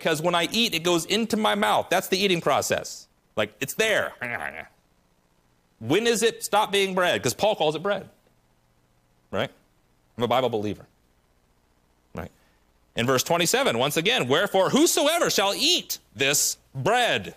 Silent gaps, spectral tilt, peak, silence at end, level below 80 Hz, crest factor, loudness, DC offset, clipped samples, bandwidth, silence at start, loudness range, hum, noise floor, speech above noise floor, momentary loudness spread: none; -3 dB/octave; -10 dBFS; 0.05 s; -62 dBFS; 16 dB; -23 LUFS; under 0.1%; under 0.1%; 15.5 kHz; 0 s; 9 LU; none; -64 dBFS; 41 dB; 13 LU